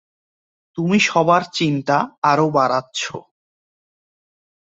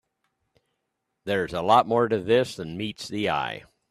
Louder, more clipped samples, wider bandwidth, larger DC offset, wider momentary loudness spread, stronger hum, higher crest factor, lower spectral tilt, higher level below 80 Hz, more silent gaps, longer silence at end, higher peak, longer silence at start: first, -18 LUFS vs -24 LUFS; neither; second, 8 kHz vs 13.5 kHz; neither; about the same, 11 LU vs 13 LU; neither; about the same, 18 dB vs 20 dB; about the same, -5 dB/octave vs -5.5 dB/octave; about the same, -62 dBFS vs -60 dBFS; first, 2.18-2.22 s vs none; first, 1.45 s vs 0.3 s; first, -2 dBFS vs -6 dBFS; second, 0.75 s vs 1.25 s